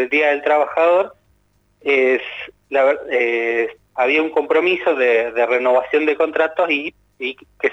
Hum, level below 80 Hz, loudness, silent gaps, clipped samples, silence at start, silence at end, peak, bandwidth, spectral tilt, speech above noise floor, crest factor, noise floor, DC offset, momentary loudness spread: 50 Hz at -65 dBFS; -62 dBFS; -17 LUFS; none; under 0.1%; 0 s; 0 s; -4 dBFS; 8 kHz; -4.5 dB/octave; 43 dB; 14 dB; -60 dBFS; under 0.1%; 12 LU